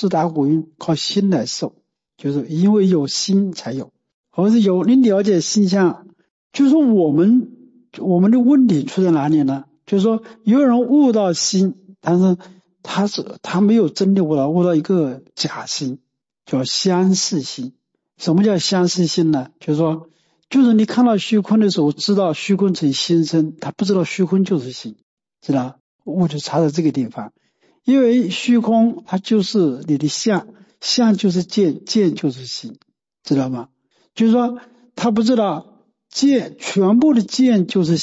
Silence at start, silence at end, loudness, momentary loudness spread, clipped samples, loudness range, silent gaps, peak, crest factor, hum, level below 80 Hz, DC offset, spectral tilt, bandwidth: 0 s; 0 s; -17 LUFS; 13 LU; under 0.1%; 4 LU; 4.14-4.24 s, 6.30-6.50 s, 25.03-25.17 s, 25.80-25.99 s; -6 dBFS; 12 dB; none; -64 dBFS; under 0.1%; -5.5 dB/octave; 8 kHz